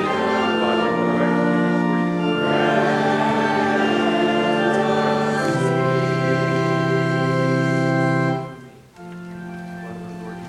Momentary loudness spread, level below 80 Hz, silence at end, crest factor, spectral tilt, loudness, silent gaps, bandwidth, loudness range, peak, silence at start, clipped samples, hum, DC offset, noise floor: 14 LU; -60 dBFS; 0 s; 16 dB; -6.5 dB/octave; -19 LUFS; none; 12 kHz; 3 LU; -4 dBFS; 0 s; under 0.1%; none; under 0.1%; -41 dBFS